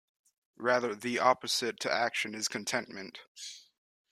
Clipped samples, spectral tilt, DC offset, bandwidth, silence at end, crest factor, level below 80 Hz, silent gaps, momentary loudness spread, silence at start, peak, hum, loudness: under 0.1%; -2 dB/octave; under 0.1%; 14 kHz; 0.5 s; 22 dB; -78 dBFS; 3.28-3.35 s; 17 LU; 0.6 s; -12 dBFS; none; -31 LUFS